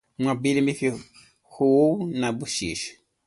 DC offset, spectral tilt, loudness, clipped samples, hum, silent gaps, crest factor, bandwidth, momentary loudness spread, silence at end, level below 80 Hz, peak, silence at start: under 0.1%; -5 dB/octave; -24 LUFS; under 0.1%; none; none; 16 dB; 11.5 kHz; 12 LU; 0.35 s; -58 dBFS; -8 dBFS; 0.2 s